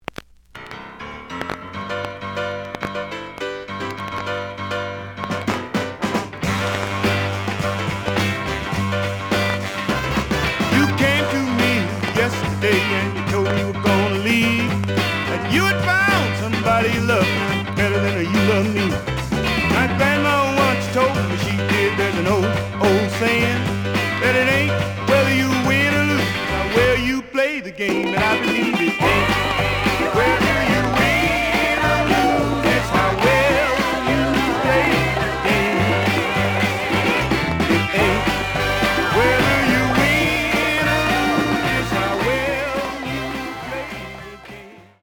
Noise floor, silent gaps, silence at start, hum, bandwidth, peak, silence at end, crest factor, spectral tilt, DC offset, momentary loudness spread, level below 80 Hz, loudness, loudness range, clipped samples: -41 dBFS; none; 0.55 s; none; over 20 kHz; -2 dBFS; 0.2 s; 16 dB; -5 dB/octave; under 0.1%; 11 LU; -38 dBFS; -19 LUFS; 7 LU; under 0.1%